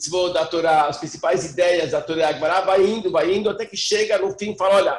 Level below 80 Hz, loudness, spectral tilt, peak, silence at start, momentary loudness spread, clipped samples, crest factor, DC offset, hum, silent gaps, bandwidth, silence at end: -56 dBFS; -20 LUFS; -3.5 dB/octave; -6 dBFS; 0 s; 6 LU; under 0.1%; 14 dB; under 0.1%; none; none; 12 kHz; 0 s